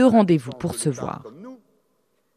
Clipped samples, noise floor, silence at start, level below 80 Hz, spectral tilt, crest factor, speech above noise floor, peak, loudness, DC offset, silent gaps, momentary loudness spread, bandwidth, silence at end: under 0.1%; -69 dBFS; 0 s; -58 dBFS; -6.5 dB/octave; 18 dB; 49 dB; -4 dBFS; -22 LUFS; under 0.1%; none; 25 LU; 14.5 kHz; 0.8 s